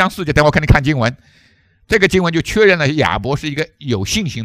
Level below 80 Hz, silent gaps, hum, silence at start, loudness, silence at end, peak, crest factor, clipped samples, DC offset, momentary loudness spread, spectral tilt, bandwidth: -28 dBFS; none; none; 0 s; -15 LUFS; 0 s; 0 dBFS; 16 dB; 0.3%; under 0.1%; 9 LU; -5.5 dB/octave; 16 kHz